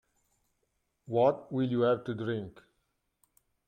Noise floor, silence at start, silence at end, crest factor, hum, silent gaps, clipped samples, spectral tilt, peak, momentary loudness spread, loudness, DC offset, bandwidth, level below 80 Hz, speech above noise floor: -79 dBFS; 1.1 s; 1.15 s; 20 dB; none; none; under 0.1%; -8.5 dB/octave; -12 dBFS; 9 LU; -30 LUFS; under 0.1%; 9.4 kHz; -72 dBFS; 49 dB